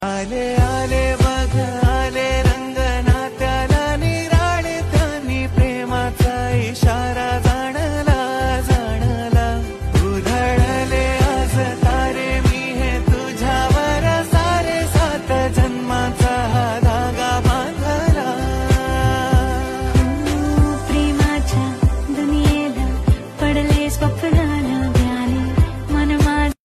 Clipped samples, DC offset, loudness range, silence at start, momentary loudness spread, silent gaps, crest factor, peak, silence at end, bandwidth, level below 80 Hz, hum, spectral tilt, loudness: under 0.1%; under 0.1%; 1 LU; 0 s; 4 LU; none; 12 dB; -4 dBFS; 0.15 s; 13.5 kHz; -22 dBFS; none; -6 dB/octave; -18 LUFS